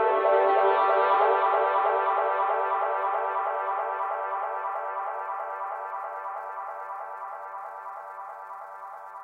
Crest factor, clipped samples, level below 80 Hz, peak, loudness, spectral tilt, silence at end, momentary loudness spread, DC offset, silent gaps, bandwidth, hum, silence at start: 16 dB; under 0.1%; under -90 dBFS; -10 dBFS; -26 LUFS; -4 dB/octave; 0 s; 17 LU; under 0.1%; none; 4.8 kHz; none; 0 s